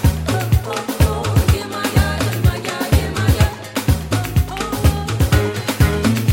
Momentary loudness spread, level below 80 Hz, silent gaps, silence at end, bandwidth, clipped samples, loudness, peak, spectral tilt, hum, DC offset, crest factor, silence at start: 4 LU; -24 dBFS; none; 0 s; 17 kHz; under 0.1%; -18 LUFS; -2 dBFS; -5.5 dB/octave; none; under 0.1%; 14 dB; 0 s